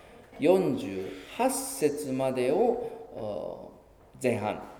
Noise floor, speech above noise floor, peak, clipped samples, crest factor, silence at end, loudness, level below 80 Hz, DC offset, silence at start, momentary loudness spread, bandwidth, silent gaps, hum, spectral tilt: -53 dBFS; 25 dB; -10 dBFS; under 0.1%; 20 dB; 0 s; -29 LUFS; -62 dBFS; under 0.1%; 0.05 s; 14 LU; 18.5 kHz; none; none; -5 dB/octave